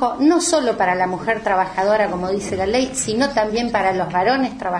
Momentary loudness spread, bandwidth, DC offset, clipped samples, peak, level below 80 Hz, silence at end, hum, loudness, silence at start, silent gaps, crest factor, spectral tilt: 4 LU; 11 kHz; under 0.1%; under 0.1%; -4 dBFS; -46 dBFS; 0 s; none; -19 LUFS; 0 s; none; 14 dB; -4 dB/octave